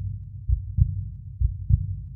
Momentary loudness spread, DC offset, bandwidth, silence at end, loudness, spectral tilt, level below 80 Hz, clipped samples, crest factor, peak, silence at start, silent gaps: 11 LU; under 0.1%; 0.3 kHz; 0 s; -27 LUFS; -15 dB/octave; -28 dBFS; under 0.1%; 20 dB; -6 dBFS; 0 s; none